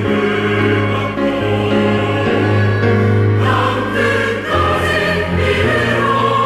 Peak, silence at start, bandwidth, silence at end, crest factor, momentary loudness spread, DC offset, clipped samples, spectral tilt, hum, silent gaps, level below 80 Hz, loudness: -4 dBFS; 0 s; 13 kHz; 0 s; 10 dB; 3 LU; under 0.1%; under 0.1%; -6.5 dB/octave; none; none; -40 dBFS; -14 LUFS